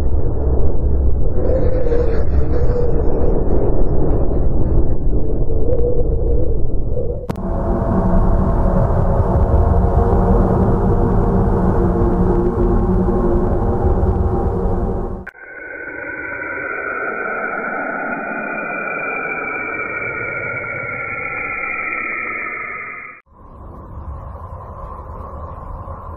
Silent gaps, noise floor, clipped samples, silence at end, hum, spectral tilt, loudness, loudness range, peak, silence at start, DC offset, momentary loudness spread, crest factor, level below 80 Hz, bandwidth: none; -40 dBFS; under 0.1%; 0 s; none; -10.5 dB/octave; -19 LUFS; 8 LU; -2 dBFS; 0 s; under 0.1%; 15 LU; 14 dB; -20 dBFS; 2.6 kHz